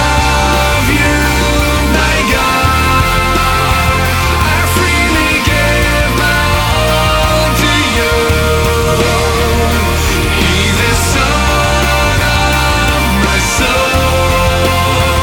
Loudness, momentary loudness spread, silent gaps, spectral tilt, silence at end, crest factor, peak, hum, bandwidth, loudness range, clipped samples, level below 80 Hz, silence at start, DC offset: -10 LUFS; 1 LU; none; -4 dB/octave; 0 s; 10 dB; 0 dBFS; none; 19.5 kHz; 1 LU; under 0.1%; -18 dBFS; 0 s; under 0.1%